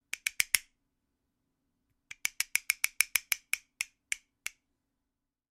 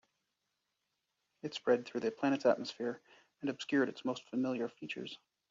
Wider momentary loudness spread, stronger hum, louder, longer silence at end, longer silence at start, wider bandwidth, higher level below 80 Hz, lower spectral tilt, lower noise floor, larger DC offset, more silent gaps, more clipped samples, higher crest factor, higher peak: first, 15 LU vs 12 LU; neither; first, -32 LUFS vs -36 LUFS; first, 1.35 s vs 0.35 s; second, 0.25 s vs 1.45 s; first, 16 kHz vs 7.4 kHz; first, -74 dBFS vs -84 dBFS; second, 4 dB/octave vs -3.5 dB/octave; about the same, -87 dBFS vs -85 dBFS; neither; neither; neither; first, 36 dB vs 20 dB; first, 0 dBFS vs -16 dBFS